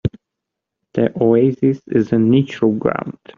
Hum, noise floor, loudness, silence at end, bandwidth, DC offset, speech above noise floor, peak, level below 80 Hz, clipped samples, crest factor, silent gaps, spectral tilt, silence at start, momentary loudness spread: none; -81 dBFS; -17 LUFS; 0.25 s; 7 kHz; under 0.1%; 65 dB; -2 dBFS; -50 dBFS; under 0.1%; 16 dB; none; -8 dB/octave; 0.05 s; 10 LU